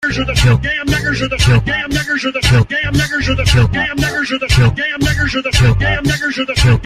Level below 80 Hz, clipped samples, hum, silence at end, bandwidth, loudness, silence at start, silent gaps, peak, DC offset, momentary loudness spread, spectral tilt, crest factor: -24 dBFS; under 0.1%; none; 0 s; 15 kHz; -14 LUFS; 0 s; none; -2 dBFS; under 0.1%; 4 LU; -5 dB/octave; 12 dB